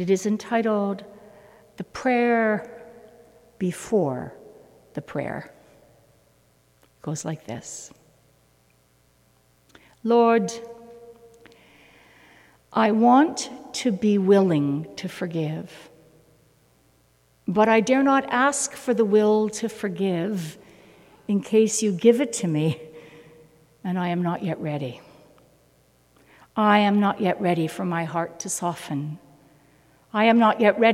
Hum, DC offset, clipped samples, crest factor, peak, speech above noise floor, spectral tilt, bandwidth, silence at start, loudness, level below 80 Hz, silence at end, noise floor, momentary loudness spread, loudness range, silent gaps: none; under 0.1%; under 0.1%; 20 dB; -4 dBFS; 39 dB; -5.5 dB/octave; 15 kHz; 0 s; -23 LUFS; -66 dBFS; 0 s; -61 dBFS; 18 LU; 14 LU; none